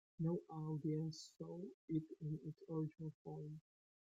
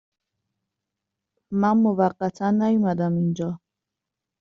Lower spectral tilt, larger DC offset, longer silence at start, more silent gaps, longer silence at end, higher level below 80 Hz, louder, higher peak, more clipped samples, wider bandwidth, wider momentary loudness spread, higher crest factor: about the same, -8.5 dB/octave vs -8.5 dB/octave; neither; second, 0.2 s vs 1.5 s; first, 1.74-1.88 s, 3.14-3.25 s vs none; second, 0.45 s vs 0.85 s; second, -82 dBFS vs -64 dBFS; second, -47 LUFS vs -22 LUFS; second, -30 dBFS vs -6 dBFS; neither; about the same, 7.8 kHz vs 7.2 kHz; about the same, 10 LU vs 10 LU; about the same, 16 dB vs 18 dB